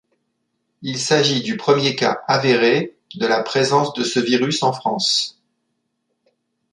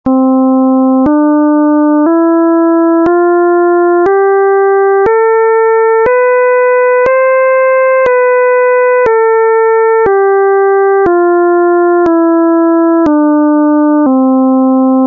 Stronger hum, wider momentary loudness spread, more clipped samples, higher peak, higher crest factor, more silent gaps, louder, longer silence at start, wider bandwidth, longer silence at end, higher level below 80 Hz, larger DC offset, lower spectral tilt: neither; first, 8 LU vs 0 LU; neither; about the same, -2 dBFS vs -2 dBFS; first, 18 dB vs 4 dB; neither; second, -18 LUFS vs -8 LUFS; first, 0.8 s vs 0.05 s; first, 11 kHz vs 3.3 kHz; first, 1.4 s vs 0 s; second, -66 dBFS vs -48 dBFS; neither; second, -4 dB/octave vs -9 dB/octave